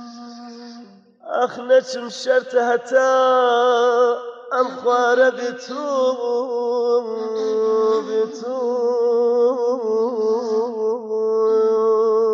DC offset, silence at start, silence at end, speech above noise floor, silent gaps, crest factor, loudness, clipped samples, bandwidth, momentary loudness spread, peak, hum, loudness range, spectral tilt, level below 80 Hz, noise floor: under 0.1%; 0 s; 0 s; 25 dB; none; 16 dB; -19 LUFS; under 0.1%; 7.6 kHz; 11 LU; -4 dBFS; none; 3 LU; -3.5 dB/octave; -84 dBFS; -43 dBFS